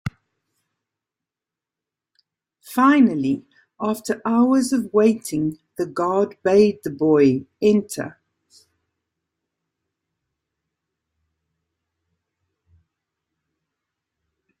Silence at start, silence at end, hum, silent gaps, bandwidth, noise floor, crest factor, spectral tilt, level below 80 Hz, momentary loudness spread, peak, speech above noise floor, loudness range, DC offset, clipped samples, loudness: 0.05 s; 6.5 s; none; none; 16 kHz; -88 dBFS; 20 dB; -6 dB/octave; -62 dBFS; 12 LU; -4 dBFS; 70 dB; 5 LU; under 0.1%; under 0.1%; -20 LUFS